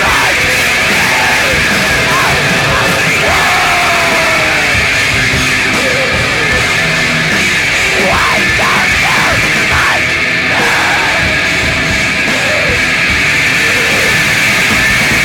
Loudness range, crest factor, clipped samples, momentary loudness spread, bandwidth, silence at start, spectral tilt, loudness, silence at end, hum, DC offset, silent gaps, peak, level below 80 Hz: 1 LU; 10 dB; under 0.1%; 2 LU; 19 kHz; 0 s; -2.5 dB/octave; -9 LUFS; 0 s; none; under 0.1%; none; 0 dBFS; -30 dBFS